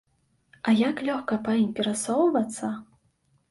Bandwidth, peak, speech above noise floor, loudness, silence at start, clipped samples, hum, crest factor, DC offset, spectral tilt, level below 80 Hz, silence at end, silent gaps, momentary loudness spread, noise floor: 11.5 kHz; -12 dBFS; 43 dB; -26 LUFS; 0.65 s; under 0.1%; none; 14 dB; under 0.1%; -4.5 dB/octave; -68 dBFS; 0.65 s; none; 10 LU; -68 dBFS